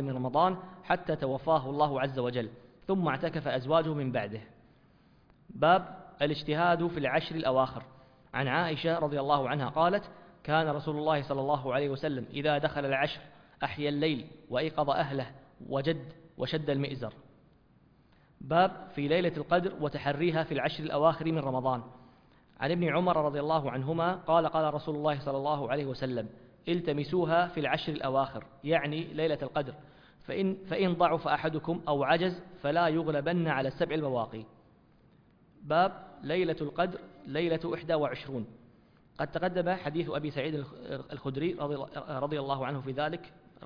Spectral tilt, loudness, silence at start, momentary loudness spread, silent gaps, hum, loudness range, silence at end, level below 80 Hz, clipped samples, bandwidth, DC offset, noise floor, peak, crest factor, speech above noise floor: -8.5 dB/octave; -31 LUFS; 0 s; 11 LU; none; none; 4 LU; 0 s; -62 dBFS; under 0.1%; 5.2 kHz; under 0.1%; -63 dBFS; -12 dBFS; 20 dB; 32 dB